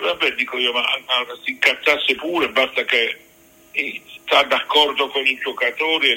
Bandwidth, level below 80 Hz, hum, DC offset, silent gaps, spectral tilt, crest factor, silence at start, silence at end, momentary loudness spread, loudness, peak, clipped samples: 16.5 kHz; -62 dBFS; none; under 0.1%; none; -1.5 dB/octave; 20 dB; 0 s; 0 s; 8 LU; -18 LUFS; 0 dBFS; under 0.1%